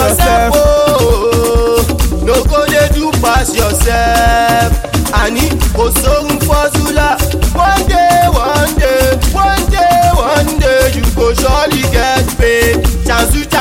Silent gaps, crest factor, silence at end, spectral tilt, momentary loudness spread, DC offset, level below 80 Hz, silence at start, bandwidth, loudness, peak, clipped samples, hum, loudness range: none; 10 dB; 0 s; -4.5 dB/octave; 3 LU; 0.3%; -16 dBFS; 0 s; 16.5 kHz; -10 LUFS; 0 dBFS; under 0.1%; none; 1 LU